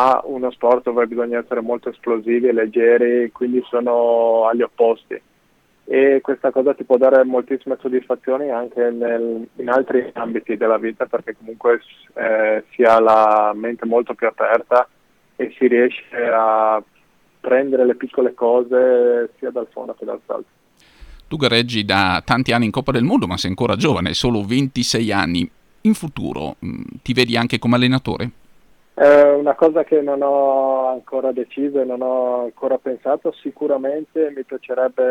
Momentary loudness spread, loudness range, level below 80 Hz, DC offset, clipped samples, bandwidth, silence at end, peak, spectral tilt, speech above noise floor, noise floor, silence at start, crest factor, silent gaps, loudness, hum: 12 LU; 5 LU; -50 dBFS; under 0.1%; under 0.1%; 14 kHz; 0 s; -2 dBFS; -5.5 dB/octave; 41 dB; -58 dBFS; 0 s; 16 dB; none; -18 LUFS; none